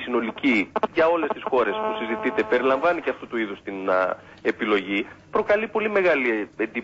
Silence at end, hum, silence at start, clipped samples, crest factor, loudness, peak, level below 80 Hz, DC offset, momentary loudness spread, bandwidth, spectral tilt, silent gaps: 0 s; none; 0 s; under 0.1%; 14 dB; -23 LUFS; -8 dBFS; -60 dBFS; under 0.1%; 8 LU; 8 kHz; -6 dB/octave; none